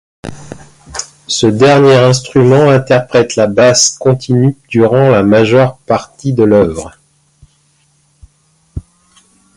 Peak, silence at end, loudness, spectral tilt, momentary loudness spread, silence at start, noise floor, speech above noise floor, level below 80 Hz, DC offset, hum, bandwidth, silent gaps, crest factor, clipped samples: 0 dBFS; 0.75 s; -9 LUFS; -5 dB/octave; 21 LU; 0.25 s; -54 dBFS; 45 dB; -40 dBFS; under 0.1%; none; 11.5 kHz; none; 10 dB; under 0.1%